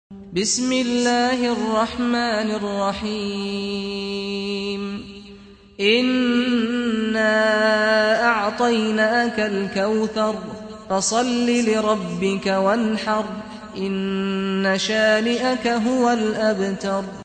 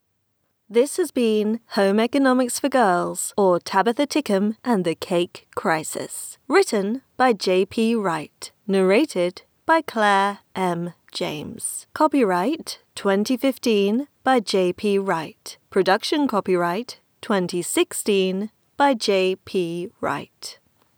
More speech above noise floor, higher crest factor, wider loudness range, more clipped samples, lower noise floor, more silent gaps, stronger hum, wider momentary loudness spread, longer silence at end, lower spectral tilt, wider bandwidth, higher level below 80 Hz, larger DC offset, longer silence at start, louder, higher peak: second, 24 dB vs 49 dB; about the same, 16 dB vs 18 dB; about the same, 5 LU vs 3 LU; neither; second, -44 dBFS vs -71 dBFS; neither; neither; about the same, 9 LU vs 11 LU; second, 0 s vs 0.45 s; about the same, -4 dB/octave vs -4.5 dB/octave; second, 9.4 kHz vs over 20 kHz; first, -54 dBFS vs -68 dBFS; neither; second, 0.1 s vs 0.7 s; about the same, -20 LUFS vs -22 LUFS; about the same, -4 dBFS vs -4 dBFS